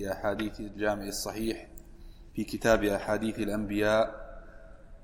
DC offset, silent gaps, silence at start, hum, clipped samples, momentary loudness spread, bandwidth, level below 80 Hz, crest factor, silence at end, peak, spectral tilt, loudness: under 0.1%; none; 0 s; none; under 0.1%; 16 LU; 16.5 kHz; -46 dBFS; 20 dB; 0 s; -10 dBFS; -4.5 dB/octave; -30 LUFS